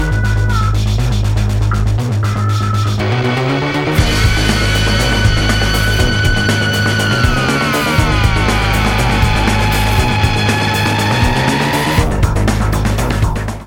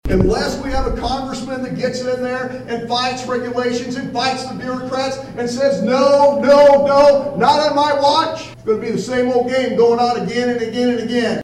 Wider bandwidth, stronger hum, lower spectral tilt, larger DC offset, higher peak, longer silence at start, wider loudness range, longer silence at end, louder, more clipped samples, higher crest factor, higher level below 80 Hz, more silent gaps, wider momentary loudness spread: first, 17 kHz vs 11.5 kHz; neither; about the same, -5 dB/octave vs -5 dB/octave; neither; about the same, 0 dBFS vs -2 dBFS; about the same, 0 s vs 0.05 s; second, 2 LU vs 8 LU; about the same, 0 s vs 0 s; about the same, -14 LUFS vs -16 LUFS; neither; about the same, 12 dB vs 12 dB; first, -20 dBFS vs -34 dBFS; neither; second, 3 LU vs 12 LU